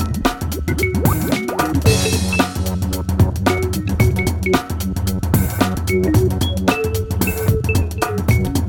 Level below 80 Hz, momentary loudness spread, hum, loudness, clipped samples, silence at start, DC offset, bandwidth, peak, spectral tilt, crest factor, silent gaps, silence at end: -26 dBFS; 5 LU; none; -18 LUFS; under 0.1%; 0 s; under 0.1%; 19 kHz; 0 dBFS; -5.5 dB/octave; 16 dB; none; 0 s